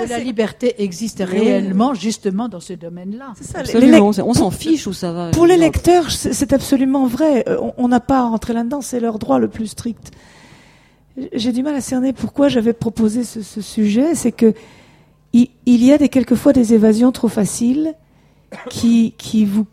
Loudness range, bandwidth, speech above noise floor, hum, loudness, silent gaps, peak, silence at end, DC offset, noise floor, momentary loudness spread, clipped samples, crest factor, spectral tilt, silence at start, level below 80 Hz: 7 LU; 15 kHz; 36 dB; none; -16 LUFS; none; 0 dBFS; 0.05 s; under 0.1%; -51 dBFS; 15 LU; under 0.1%; 16 dB; -5.5 dB/octave; 0 s; -40 dBFS